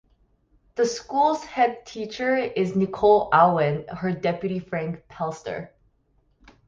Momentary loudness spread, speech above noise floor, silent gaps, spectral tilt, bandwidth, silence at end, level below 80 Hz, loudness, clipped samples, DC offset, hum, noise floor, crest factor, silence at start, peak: 16 LU; 42 dB; none; -6 dB/octave; 7.6 kHz; 1 s; -58 dBFS; -23 LUFS; under 0.1%; under 0.1%; none; -65 dBFS; 20 dB; 0.75 s; -4 dBFS